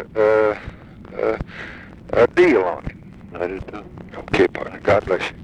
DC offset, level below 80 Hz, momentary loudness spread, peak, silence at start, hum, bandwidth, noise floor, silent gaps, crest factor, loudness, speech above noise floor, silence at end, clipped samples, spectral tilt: under 0.1%; -42 dBFS; 21 LU; -2 dBFS; 0 s; none; 9.4 kHz; -38 dBFS; none; 18 dB; -19 LUFS; 20 dB; 0 s; under 0.1%; -6.5 dB/octave